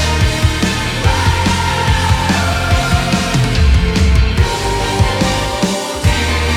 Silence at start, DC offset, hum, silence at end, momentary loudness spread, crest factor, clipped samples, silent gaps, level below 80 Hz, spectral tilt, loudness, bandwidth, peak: 0 s; under 0.1%; none; 0 s; 3 LU; 12 dB; under 0.1%; none; -18 dBFS; -4.5 dB/octave; -14 LUFS; 16 kHz; 0 dBFS